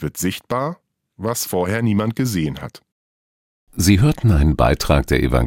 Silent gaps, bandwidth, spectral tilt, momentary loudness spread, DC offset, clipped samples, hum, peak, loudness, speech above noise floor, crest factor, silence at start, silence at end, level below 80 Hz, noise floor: 2.92-3.67 s; 17 kHz; -5.5 dB/octave; 13 LU; under 0.1%; under 0.1%; none; -2 dBFS; -19 LUFS; over 72 dB; 18 dB; 0 s; 0 s; -28 dBFS; under -90 dBFS